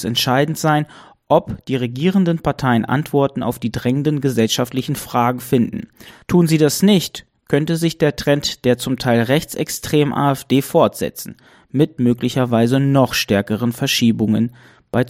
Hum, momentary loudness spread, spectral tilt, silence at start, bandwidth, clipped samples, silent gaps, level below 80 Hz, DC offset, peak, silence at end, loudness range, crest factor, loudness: none; 8 LU; -5.5 dB/octave; 0 s; 16.5 kHz; under 0.1%; none; -48 dBFS; under 0.1%; 0 dBFS; 0 s; 2 LU; 18 dB; -17 LUFS